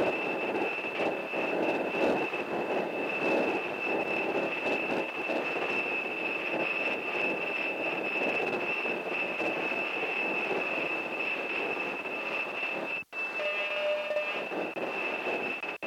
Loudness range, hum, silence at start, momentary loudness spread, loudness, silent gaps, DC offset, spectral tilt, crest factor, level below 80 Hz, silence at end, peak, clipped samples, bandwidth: 2 LU; none; 0 s; 3 LU; -30 LUFS; none; under 0.1%; -4.5 dB/octave; 16 dB; -76 dBFS; 0 s; -16 dBFS; under 0.1%; 16.5 kHz